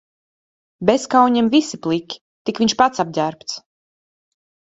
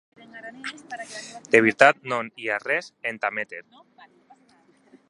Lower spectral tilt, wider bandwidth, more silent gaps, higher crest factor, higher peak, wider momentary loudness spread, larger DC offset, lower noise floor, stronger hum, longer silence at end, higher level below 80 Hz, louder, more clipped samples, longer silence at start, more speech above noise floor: about the same, -4.5 dB/octave vs -4 dB/octave; second, 8 kHz vs 11.5 kHz; first, 2.21-2.45 s vs none; second, 20 dB vs 26 dB; about the same, 0 dBFS vs 0 dBFS; second, 15 LU vs 20 LU; neither; first, under -90 dBFS vs -59 dBFS; neither; second, 1.1 s vs 1.5 s; first, -58 dBFS vs -72 dBFS; first, -18 LUFS vs -22 LUFS; neither; first, 0.8 s vs 0.35 s; first, over 73 dB vs 35 dB